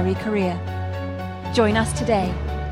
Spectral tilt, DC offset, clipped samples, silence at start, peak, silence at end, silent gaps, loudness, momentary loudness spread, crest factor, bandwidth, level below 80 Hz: -6 dB/octave; under 0.1%; under 0.1%; 0 s; -6 dBFS; 0 s; none; -23 LUFS; 9 LU; 18 dB; 14.5 kHz; -34 dBFS